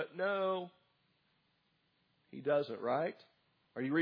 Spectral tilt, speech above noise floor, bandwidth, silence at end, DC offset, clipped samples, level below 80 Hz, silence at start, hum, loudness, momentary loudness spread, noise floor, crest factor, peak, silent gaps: -4.5 dB/octave; 42 dB; 5.2 kHz; 0 s; under 0.1%; under 0.1%; under -90 dBFS; 0 s; none; -37 LUFS; 17 LU; -77 dBFS; 18 dB; -20 dBFS; none